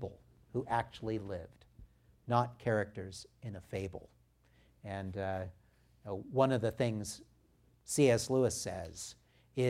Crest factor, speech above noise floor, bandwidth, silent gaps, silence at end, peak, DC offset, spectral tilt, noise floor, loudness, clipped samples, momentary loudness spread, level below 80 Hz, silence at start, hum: 22 dB; 33 dB; 16 kHz; none; 0 s; -14 dBFS; under 0.1%; -5.5 dB/octave; -68 dBFS; -36 LUFS; under 0.1%; 18 LU; -64 dBFS; 0 s; none